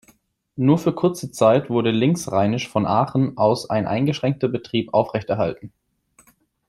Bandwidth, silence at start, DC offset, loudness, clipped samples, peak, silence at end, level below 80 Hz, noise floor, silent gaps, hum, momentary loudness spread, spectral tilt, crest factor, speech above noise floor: 15.5 kHz; 0.55 s; under 0.1%; -21 LUFS; under 0.1%; -2 dBFS; 1 s; -58 dBFS; -59 dBFS; none; none; 6 LU; -6.5 dB/octave; 18 dB; 39 dB